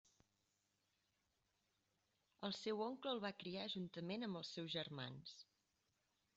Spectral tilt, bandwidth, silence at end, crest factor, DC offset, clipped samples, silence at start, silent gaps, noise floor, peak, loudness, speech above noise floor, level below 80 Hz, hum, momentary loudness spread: -3.5 dB/octave; 7.6 kHz; 0.95 s; 20 dB; under 0.1%; under 0.1%; 2.4 s; none; -86 dBFS; -32 dBFS; -48 LUFS; 38 dB; -86 dBFS; none; 7 LU